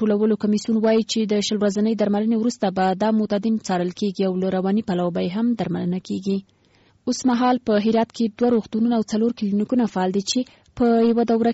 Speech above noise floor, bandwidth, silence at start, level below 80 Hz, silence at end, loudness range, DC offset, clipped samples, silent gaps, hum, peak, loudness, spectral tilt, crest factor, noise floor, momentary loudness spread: 38 dB; 8 kHz; 0 s; -58 dBFS; 0 s; 3 LU; under 0.1%; under 0.1%; none; none; -10 dBFS; -21 LUFS; -5.5 dB/octave; 12 dB; -58 dBFS; 6 LU